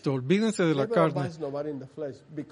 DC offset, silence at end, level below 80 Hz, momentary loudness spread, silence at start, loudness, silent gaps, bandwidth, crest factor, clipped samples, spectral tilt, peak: under 0.1%; 0 s; -70 dBFS; 14 LU; 0.05 s; -27 LUFS; none; 10.5 kHz; 18 dB; under 0.1%; -6.5 dB/octave; -8 dBFS